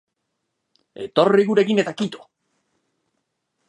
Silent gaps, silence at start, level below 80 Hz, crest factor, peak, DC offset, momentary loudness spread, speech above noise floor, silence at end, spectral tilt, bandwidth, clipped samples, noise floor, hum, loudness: none; 1 s; -72 dBFS; 22 dB; -2 dBFS; under 0.1%; 17 LU; 58 dB; 1.5 s; -6 dB/octave; 10 kHz; under 0.1%; -77 dBFS; none; -19 LUFS